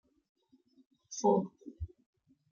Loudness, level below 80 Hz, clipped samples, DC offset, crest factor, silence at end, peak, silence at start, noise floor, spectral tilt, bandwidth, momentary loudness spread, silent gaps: -33 LUFS; -58 dBFS; under 0.1%; under 0.1%; 22 dB; 0.65 s; -16 dBFS; 1.1 s; -68 dBFS; -6.5 dB/octave; 7.2 kHz; 18 LU; none